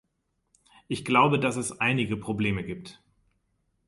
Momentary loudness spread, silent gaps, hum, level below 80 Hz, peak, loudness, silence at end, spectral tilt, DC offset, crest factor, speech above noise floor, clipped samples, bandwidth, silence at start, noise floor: 14 LU; none; none; -56 dBFS; -8 dBFS; -26 LUFS; 0.95 s; -5 dB/octave; under 0.1%; 22 dB; 50 dB; under 0.1%; 11.5 kHz; 0.9 s; -76 dBFS